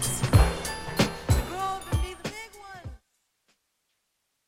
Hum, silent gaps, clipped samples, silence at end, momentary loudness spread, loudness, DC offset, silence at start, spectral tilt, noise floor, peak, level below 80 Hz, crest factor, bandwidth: none; none; under 0.1%; 1.5 s; 21 LU; -27 LUFS; under 0.1%; 0 s; -4.5 dB/octave; -77 dBFS; -8 dBFS; -34 dBFS; 22 dB; 16.5 kHz